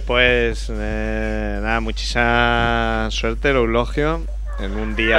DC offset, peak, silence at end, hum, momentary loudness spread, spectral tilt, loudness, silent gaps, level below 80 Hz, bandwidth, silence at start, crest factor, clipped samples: under 0.1%; 0 dBFS; 0 s; none; 10 LU; -5 dB/octave; -20 LUFS; none; -24 dBFS; 10.5 kHz; 0 s; 18 dB; under 0.1%